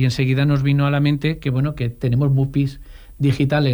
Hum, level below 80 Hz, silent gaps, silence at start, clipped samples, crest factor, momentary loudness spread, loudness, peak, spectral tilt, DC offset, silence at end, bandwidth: none; -40 dBFS; none; 0 s; under 0.1%; 12 dB; 5 LU; -19 LUFS; -6 dBFS; -8 dB/octave; under 0.1%; 0 s; over 20 kHz